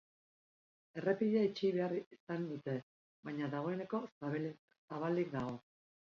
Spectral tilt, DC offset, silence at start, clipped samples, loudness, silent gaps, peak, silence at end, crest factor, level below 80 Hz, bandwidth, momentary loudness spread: -6.5 dB/octave; under 0.1%; 0.95 s; under 0.1%; -39 LUFS; 2.06-2.11 s, 2.20-2.27 s, 2.83-3.23 s, 4.12-4.21 s, 4.59-4.68 s, 4.78-4.88 s; -20 dBFS; 0.55 s; 20 dB; -78 dBFS; 7 kHz; 12 LU